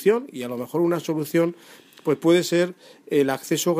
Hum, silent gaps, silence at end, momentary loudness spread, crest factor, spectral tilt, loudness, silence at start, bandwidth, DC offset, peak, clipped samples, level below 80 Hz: none; none; 0 s; 8 LU; 16 dB; -5 dB/octave; -23 LUFS; 0 s; 15.5 kHz; under 0.1%; -6 dBFS; under 0.1%; -72 dBFS